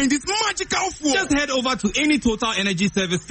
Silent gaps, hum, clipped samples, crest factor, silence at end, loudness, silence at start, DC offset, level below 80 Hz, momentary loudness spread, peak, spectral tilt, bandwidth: none; none; under 0.1%; 14 dB; 0 s; -20 LUFS; 0 s; under 0.1%; -44 dBFS; 3 LU; -8 dBFS; -3 dB/octave; 8.8 kHz